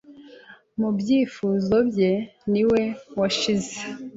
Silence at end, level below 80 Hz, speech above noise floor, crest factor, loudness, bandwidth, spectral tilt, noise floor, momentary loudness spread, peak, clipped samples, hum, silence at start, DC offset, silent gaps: 0 s; -56 dBFS; 26 dB; 14 dB; -23 LUFS; 8 kHz; -5.5 dB/octave; -48 dBFS; 8 LU; -10 dBFS; under 0.1%; none; 0.1 s; under 0.1%; none